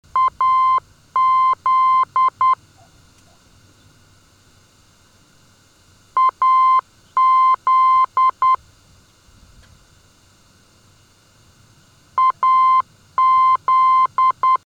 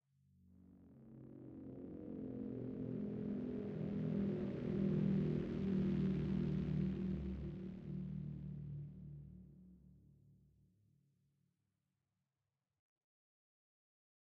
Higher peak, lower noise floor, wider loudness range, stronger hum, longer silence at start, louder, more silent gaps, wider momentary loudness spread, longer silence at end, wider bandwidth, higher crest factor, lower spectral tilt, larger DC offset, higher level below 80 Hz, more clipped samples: first, -8 dBFS vs -28 dBFS; second, -53 dBFS vs under -90 dBFS; second, 11 LU vs 14 LU; neither; second, 0.15 s vs 0.6 s; first, -16 LUFS vs -42 LUFS; neither; second, 6 LU vs 18 LU; second, 0.1 s vs 4.05 s; first, 7.8 kHz vs 5.4 kHz; second, 10 dB vs 16 dB; second, -2.5 dB/octave vs -10.5 dB/octave; neither; about the same, -60 dBFS vs -60 dBFS; neither